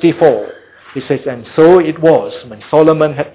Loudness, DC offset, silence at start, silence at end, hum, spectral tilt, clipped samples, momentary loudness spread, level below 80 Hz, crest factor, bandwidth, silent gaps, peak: -11 LUFS; under 0.1%; 0 s; 0.05 s; none; -11 dB/octave; under 0.1%; 19 LU; -52 dBFS; 12 dB; 4 kHz; none; 0 dBFS